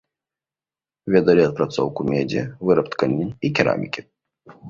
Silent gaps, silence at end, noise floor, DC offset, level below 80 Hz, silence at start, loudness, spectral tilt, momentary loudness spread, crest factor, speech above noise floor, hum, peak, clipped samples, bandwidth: none; 0 s; under -90 dBFS; under 0.1%; -54 dBFS; 1.05 s; -20 LUFS; -7 dB/octave; 9 LU; 20 dB; over 70 dB; none; -2 dBFS; under 0.1%; 7.4 kHz